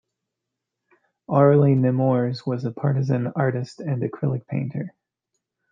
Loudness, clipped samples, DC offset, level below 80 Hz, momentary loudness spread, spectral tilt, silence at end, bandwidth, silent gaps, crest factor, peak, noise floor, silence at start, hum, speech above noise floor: -22 LUFS; under 0.1%; under 0.1%; -66 dBFS; 12 LU; -9.5 dB/octave; 0.85 s; 7.2 kHz; none; 18 dB; -4 dBFS; -83 dBFS; 1.3 s; none; 62 dB